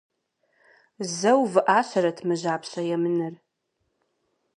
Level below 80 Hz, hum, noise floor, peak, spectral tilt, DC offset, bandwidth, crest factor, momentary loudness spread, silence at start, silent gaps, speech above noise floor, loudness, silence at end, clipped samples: -80 dBFS; none; -76 dBFS; -4 dBFS; -5 dB/octave; under 0.1%; 11 kHz; 22 dB; 10 LU; 1 s; none; 53 dB; -24 LUFS; 1.2 s; under 0.1%